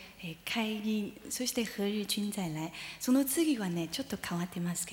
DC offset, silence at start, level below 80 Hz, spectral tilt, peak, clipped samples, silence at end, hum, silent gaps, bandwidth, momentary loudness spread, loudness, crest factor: under 0.1%; 0 s; -66 dBFS; -4 dB/octave; -18 dBFS; under 0.1%; 0 s; none; none; 19.5 kHz; 8 LU; -33 LUFS; 16 dB